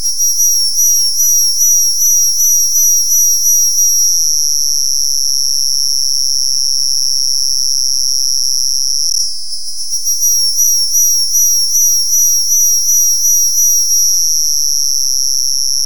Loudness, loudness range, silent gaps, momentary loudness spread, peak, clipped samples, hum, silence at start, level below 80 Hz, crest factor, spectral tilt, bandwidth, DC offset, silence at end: -9 LUFS; 3 LU; none; 4 LU; -2 dBFS; under 0.1%; none; 0 s; under -90 dBFS; 12 dB; 4.5 dB/octave; over 20 kHz; 10%; 0 s